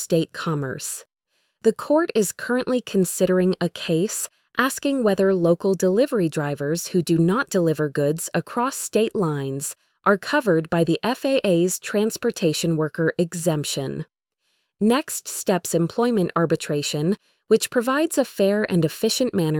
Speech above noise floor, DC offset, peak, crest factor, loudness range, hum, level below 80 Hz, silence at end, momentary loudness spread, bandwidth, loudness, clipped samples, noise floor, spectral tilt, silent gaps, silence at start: 51 dB; under 0.1%; -6 dBFS; 16 dB; 3 LU; none; -62 dBFS; 0 s; 6 LU; 19 kHz; -22 LUFS; under 0.1%; -72 dBFS; -5 dB/octave; none; 0 s